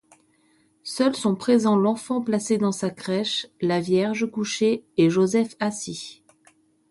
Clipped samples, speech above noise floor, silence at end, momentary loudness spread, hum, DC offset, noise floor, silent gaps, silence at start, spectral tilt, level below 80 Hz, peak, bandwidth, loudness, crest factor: under 0.1%; 40 dB; 0.8 s; 11 LU; none; under 0.1%; -63 dBFS; none; 0.85 s; -5 dB/octave; -68 dBFS; -8 dBFS; 11.5 kHz; -23 LUFS; 16 dB